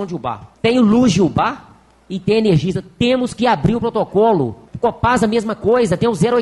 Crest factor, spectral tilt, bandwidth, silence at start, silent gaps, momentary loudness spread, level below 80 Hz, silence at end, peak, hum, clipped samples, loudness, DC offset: 12 dB; -6.5 dB/octave; 11.5 kHz; 0 s; none; 11 LU; -42 dBFS; 0 s; -4 dBFS; none; under 0.1%; -16 LUFS; under 0.1%